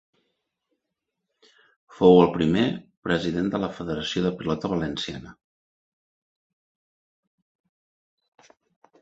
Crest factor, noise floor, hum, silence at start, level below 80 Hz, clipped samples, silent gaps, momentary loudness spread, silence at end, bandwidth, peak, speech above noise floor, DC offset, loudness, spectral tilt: 24 dB; -83 dBFS; none; 2 s; -54 dBFS; under 0.1%; 2.97-3.02 s; 14 LU; 3.7 s; 8 kHz; -2 dBFS; 60 dB; under 0.1%; -23 LUFS; -6.5 dB/octave